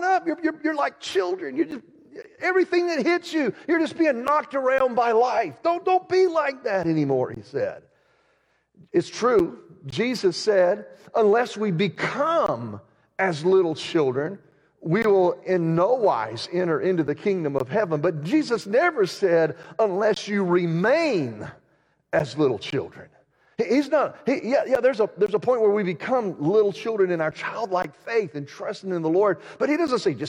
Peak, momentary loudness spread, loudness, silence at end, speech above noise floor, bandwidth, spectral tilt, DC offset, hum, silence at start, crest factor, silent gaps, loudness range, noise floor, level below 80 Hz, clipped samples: -10 dBFS; 9 LU; -23 LUFS; 0 s; 44 dB; 11 kHz; -6 dB/octave; under 0.1%; none; 0 s; 14 dB; none; 3 LU; -66 dBFS; -66 dBFS; under 0.1%